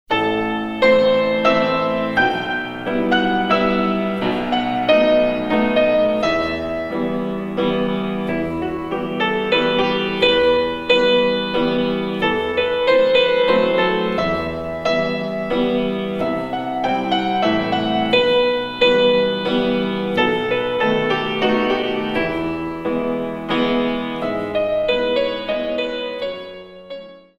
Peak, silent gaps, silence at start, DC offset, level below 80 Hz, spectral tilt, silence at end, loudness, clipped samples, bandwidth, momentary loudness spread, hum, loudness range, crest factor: -2 dBFS; none; 0.1 s; under 0.1%; -44 dBFS; -6 dB/octave; 0.2 s; -18 LUFS; under 0.1%; 8 kHz; 9 LU; none; 4 LU; 16 dB